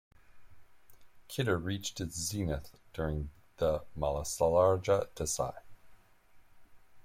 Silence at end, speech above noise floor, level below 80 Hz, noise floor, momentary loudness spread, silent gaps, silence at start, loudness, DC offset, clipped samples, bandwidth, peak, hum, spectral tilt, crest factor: 0.05 s; 28 dB; -50 dBFS; -60 dBFS; 12 LU; none; 0.35 s; -33 LUFS; under 0.1%; under 0.1%; 16.5 kHz; -16 dBFS; none; -4.5 dB/octave; 20 dB